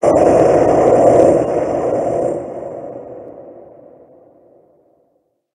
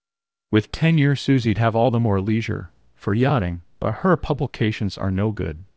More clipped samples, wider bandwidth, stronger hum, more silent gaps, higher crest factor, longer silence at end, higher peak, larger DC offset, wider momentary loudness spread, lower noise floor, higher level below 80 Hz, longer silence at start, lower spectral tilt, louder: neither; first, 11 kHz vs 8 kHz; neither; neither; about the same, 16 dB vs 16 dB; first, 1.95 s vs 0.15 s; first, 0 dBFS vs -4 dBFS; second, under 0.1% vs 0.1%; first, 22 LU vs 9 LU; second, -63 dBFS vs under -90 dBFS; about the same, -44 dBFS vs -40 dBFS; second, 0 s vs 0.5 s; about the same, -7.5 dB/octave vs -8 dB/octave; first, -13 LUFS vs -21 LUFS